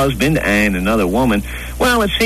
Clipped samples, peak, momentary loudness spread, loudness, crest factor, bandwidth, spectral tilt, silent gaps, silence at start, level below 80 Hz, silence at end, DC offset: under 0.1%; -2 dBFS; 4 LU; -15 LUFS; 12 dB; 14 kHz; -5 dB/octave; none; 0 s; -28 dBFS; 0 s; 0.2%